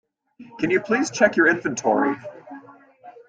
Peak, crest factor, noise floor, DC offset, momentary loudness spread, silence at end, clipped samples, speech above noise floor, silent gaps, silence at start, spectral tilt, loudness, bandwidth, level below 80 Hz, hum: -4 dBFS; 20 dB; -47 dBFS; under 0.1%; 21 LU; 0.15 s; under 0.1%; 26 dB; none; 0.4 s; -4.5 dB/octave; -20 LUFS; 9.2 kHz; -64 dBFS; none